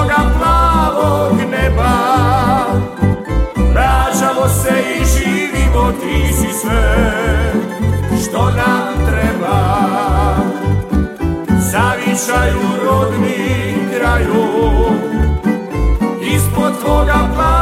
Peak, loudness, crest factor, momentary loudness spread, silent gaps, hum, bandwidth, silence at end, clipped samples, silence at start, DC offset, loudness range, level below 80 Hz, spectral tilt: 0 dBFS; -14 LUFS; 12 dB; 4 LU; none; none; 16 kHz; 0 s; under 0.1%; 0 s; under 0.1%; 1 LU; -18 dBFS; -5.5 dB/octave